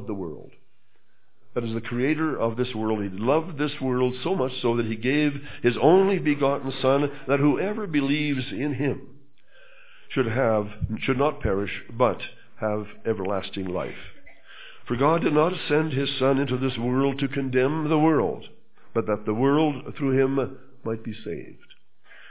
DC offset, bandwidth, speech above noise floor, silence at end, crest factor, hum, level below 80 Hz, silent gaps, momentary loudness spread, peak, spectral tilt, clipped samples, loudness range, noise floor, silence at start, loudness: 1%; 4 kHz; 45 dB; 0 s; 20 dB; none; -50 dBFS; none; 12 LU; -4 dBFS; -11 dB/octave; under 0.1%; 5 LU; -69 dBFS; 0 s; -25 LUFS